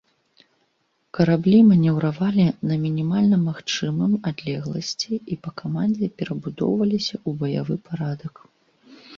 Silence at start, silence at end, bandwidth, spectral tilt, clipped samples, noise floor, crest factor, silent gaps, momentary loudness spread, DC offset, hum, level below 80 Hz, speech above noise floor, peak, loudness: 1.15 s; 0 s; 7.4 kHz; -7 dB/octave; under 0.1%; -69 dBFS; 16 dB; none; 13 LU; under 0.1%; none; -60 dBFS; 48 dB; -6 dBFS; -22 LUFS